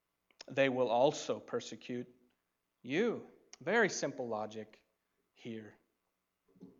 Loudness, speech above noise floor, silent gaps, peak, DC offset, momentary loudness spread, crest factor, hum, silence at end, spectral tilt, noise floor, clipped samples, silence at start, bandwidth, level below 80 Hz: -35 LUFS; 50 dB; none; -16 dBFS; under 0.1%; 22 LU; 22 dB; none; 0.1 s; -4 dB/octave; -85 dBFS; under 0.1%; 0.5 s; 7.8 kHz; -86 dBFS